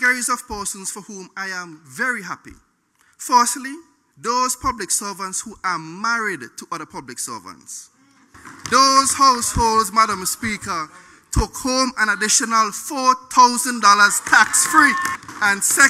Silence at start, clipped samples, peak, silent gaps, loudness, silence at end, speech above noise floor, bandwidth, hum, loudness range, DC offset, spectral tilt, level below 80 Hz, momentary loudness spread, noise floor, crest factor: 0 s; under 0.1%; 0 dBFS; none; -17 LUFS; 0 s; 41 dB; 16 kHz; none; 10 LU; under 0.1%; -1.5 dB/octave; -40 dBFS; 19 LU; -60 dBFS; 20 dB